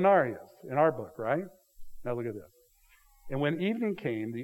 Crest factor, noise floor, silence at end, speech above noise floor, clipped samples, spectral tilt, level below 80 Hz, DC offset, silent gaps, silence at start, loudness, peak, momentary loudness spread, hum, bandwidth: 20 dB; -63 dBFS; 0 s; 33 dB; under 0.1%; -8 dB/octave; -60 dBFS; under 0.1%; none; 0 s; -31 LUFS; -10 dBFS; 15 LU; none; 16.5 kHz